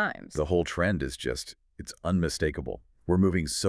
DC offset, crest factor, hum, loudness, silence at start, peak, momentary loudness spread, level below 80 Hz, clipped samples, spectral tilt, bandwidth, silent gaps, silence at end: under 0.1%; 16 dB; none; -28 LUFS; 0 s; -12 dBFS; 15 LU; -44 dBFS; under 0.1%; -5 dB/octave; 11 kHz; none; 0 s